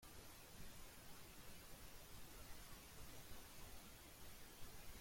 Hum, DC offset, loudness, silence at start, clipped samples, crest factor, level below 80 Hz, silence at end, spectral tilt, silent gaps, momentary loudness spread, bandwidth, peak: none; under 0.1%; -60 LUFS; 0 s; under 0.1%; 16 dB; -64 dBFS; 0 s; -3 dB/octave; none; 1 LU; 16.5 kHz; -42 dBFS